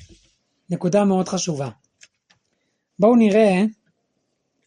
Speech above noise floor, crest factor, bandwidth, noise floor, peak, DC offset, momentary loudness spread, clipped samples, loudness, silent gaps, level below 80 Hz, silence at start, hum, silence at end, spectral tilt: 55 dB; 18 dB; 10.5 kHz; -73 dBFS; -4 dBFS; under 0.1%; 14 LU; under 0.1%; -19 LUFS; none; -64 dBFS; 0.7 s; none; 0.95 s; -6 dB/octave